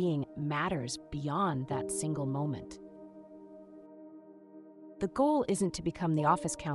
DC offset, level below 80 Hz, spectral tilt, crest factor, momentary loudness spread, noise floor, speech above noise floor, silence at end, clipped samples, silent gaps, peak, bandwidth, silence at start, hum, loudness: under 0.1%; -60 dBFS; -5.5 dB/octave; 20 dB; 23 LU; -53 dBFS; 21 dB; 0 s; under 0.1%; none; -12 dBFS; 13.5 kHz; 0 s; none; -33 LUFS